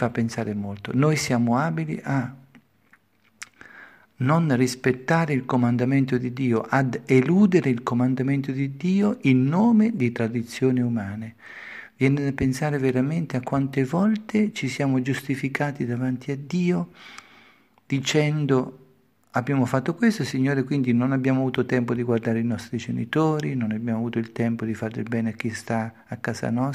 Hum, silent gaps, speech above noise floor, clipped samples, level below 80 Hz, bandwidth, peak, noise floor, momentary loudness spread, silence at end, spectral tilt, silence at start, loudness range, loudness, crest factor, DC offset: none; none; 38 dB; under 0.1%; -60 dBFS; 14 kHz; -4 dBFS; -61 dBFS; 9 LU; 0 s; -7 dB/octave; 0 s; 5 LU; -24 LUFS; 18 dB; under 0.1%